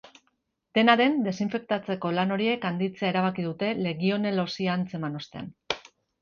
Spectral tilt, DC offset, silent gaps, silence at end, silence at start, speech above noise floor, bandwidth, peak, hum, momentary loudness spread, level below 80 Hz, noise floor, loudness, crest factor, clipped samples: -6.5 dB/octave; under 0.1%; none; 0.4 s; 0.05 s; 48 dB; 7 kHz; -2 dBFS; none; 13 LU; -66 dBFS; -74 dBFS; -27 LUFS; 24 dB; under 0.1%